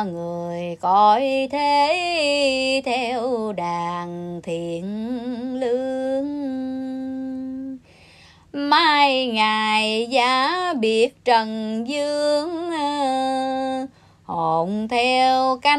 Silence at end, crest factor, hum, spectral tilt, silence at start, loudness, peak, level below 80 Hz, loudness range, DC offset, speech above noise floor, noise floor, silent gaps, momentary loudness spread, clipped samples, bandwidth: 0 s; 18 dB; none; -4 dB/octave; 0 s; -21 LUFS; -4 dBFS; -60 dBFS; 8 LU; under 0.1%; 29 dB; -49 dBFS; none; 12 LU; under 0.1%; 12.5 kHz